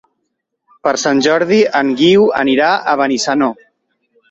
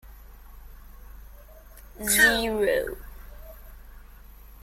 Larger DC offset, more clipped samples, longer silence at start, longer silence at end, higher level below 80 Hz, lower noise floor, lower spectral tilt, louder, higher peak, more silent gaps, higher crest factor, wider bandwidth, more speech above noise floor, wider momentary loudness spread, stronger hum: neither; neither; first, 0.85 s vs 0.05 s; first, 0.8 s vs 0.05 s; second, -58 dBFS vs -44 dBFS; first, -71 dBFS vs -47 dBFS; first, -4 dB/octave vs -1.5 dB/octave; first, -13 LUFS vs -22 LUFS; first, -2 dBFS vs -6 dBFS; neither; second, 12 dB vs 22 dB; second, 8 kHz vs 16.5 kHz; first, 59 dB vs 24 dB; second, 6 LU vs 29 LU; neither